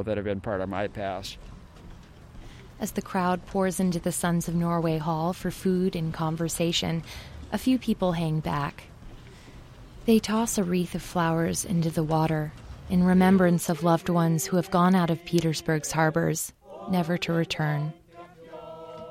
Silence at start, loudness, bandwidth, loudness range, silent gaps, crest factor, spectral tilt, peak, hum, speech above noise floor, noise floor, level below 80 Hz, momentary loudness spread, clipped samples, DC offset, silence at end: 0 s; -26 LUFS; 16 kHz; 7 LU; none; 18 dB; -5.5 dB/octave; -8 dBFS; none; 22 dB; -48 dBFS; -48 dBFS; 13 LU; under 0.1%; under 0.1%; 0 s